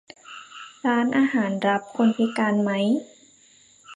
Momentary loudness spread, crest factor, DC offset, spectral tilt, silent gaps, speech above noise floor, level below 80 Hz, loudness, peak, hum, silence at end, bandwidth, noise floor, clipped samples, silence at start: 19 LU; 16 dB; under 0.1%; -6 dB/octave; none; 33 dB; -74 dBFS; -23 LUFS; -8 dBFS; none; 0 s; 10 kHz; -55 dBFS; under 0.1%; 0.3 s